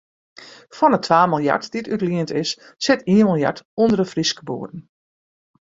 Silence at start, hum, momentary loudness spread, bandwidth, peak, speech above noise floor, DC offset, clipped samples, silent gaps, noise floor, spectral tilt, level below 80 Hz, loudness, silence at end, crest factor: 0.4 s; none; 14 LU; 7.8 kHz; -2 dBFS; over 71 dB; under 0.1%; under 0.1%; 3.65-3.77 s; under -90 dBFS; -5.5 dB/octave; -58 dBFS; -19 LUFS; 1 s; 18 dB